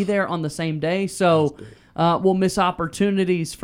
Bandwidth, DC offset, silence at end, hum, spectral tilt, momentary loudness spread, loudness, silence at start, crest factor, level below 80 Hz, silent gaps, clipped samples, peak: 15.5 kHz; under 0.1%; 0 s; none; -6 dB/octave; 7 LU; -21 LUFS; 0 s; 16 dB; -52 dBFS; none; under 0.1%; -6 dBFS